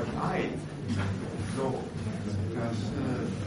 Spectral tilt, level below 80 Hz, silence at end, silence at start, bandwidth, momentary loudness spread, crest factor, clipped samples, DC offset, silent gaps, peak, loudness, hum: -7 dB/octave; -52 dBFS; 0 s; 0 s; 10.5 kHz; 4 LU; 14 dB; under 0.1%; under 0.1%; none; -16 dBFS; -33 LUFS; none